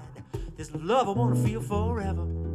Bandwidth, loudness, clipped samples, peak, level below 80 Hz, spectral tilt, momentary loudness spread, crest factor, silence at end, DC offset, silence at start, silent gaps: 13.5 kHz; -28 LUFS; under 0.1%; -12 dBFS; -40 dBFS; -7 dB/octave; 14 LU; 16 dB; 0 s; under 0.1%; 0 s; none